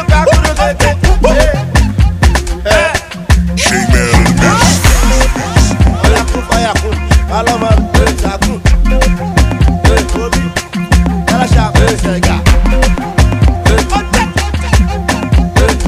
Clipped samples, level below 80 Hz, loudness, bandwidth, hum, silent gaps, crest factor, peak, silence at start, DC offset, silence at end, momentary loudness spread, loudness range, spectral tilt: 0.8%; -12 dBFS; -11 LUFS; 15.5 kHz; none; none; 8 dB; 0 dBFS; 0 s; under 0.1%; 0 s; 5 LU; 2 LU; -5 dB/octave